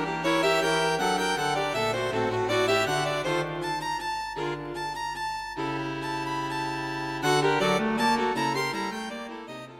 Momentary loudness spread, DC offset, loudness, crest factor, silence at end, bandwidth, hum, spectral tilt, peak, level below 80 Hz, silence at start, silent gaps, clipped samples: 9 LU; under 0.1%; -27 LUFS; 16 dB; 0 s; 16.5 kHz; 50 Hz at -55 dBFS; -4 dB/octave; -10 dBFS; -54 dBFS; 0 s; none; under 0.1%